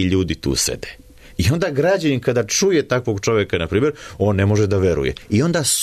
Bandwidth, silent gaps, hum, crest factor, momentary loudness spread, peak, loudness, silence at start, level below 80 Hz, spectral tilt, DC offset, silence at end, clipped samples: 13.5 kHz; none; none; 12 dB; 5 LU; -6 dBFS; -18 LUFS; 0 s; -38 dBFS; -4.5 dB/octave; under 0.1%; 0 s; under 0.1%